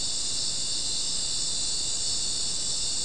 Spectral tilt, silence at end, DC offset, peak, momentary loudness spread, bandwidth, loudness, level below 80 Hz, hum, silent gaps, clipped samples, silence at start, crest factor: 0.5 dB/octave; 0 s; 2%; -16 dBFS; 1 LU; 12 kHz; -26 LUFS; -48 dBFS; none; none; under 0.1%; 0 s; 14 dB